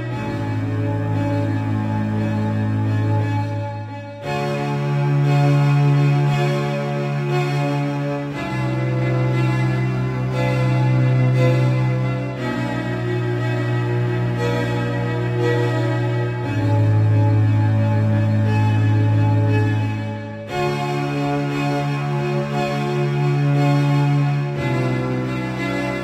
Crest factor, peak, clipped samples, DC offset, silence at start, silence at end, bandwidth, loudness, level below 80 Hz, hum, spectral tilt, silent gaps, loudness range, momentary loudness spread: 14 dB; -6 dBFS; under 0.1%; under 0.1%; 0 s; 0 s; 9.2 kHz; -20 LUFS; -46 dBFS; none; -8 dB/octave; none; 4 LU; 7 LU